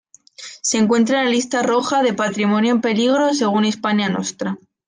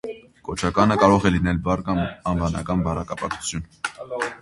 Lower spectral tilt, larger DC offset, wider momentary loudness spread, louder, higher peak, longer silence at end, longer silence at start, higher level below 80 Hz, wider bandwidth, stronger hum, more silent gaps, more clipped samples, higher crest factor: second, -4 dB/octave vs -6 dB/octave; neither; second, 8 LU vs 15 LU; first, -18 LUFS vs -22 LUFS; about the same, -4 dBFS vs -2 dBFS; first, 0.3 s vs 0 s; first, 0.4 s vs 0.05 s; second, -66 dBFS vs -38 dBFS; second, 10 kHz vs 11.5 kHz; neither; neither; neither; second, 14 dB vs 22 dB